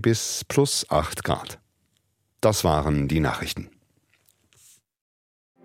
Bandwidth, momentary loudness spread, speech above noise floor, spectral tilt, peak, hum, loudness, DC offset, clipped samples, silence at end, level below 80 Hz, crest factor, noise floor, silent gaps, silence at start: 16.5 kHz; 13 LU; 48 dB; -4.5 dB/octave; -6 dBFS; none; -24 LUFS; under 0.1%; under 0.1%; 2 s; -42 dBFS; 20 dB; -71 dBFS; none; 0 s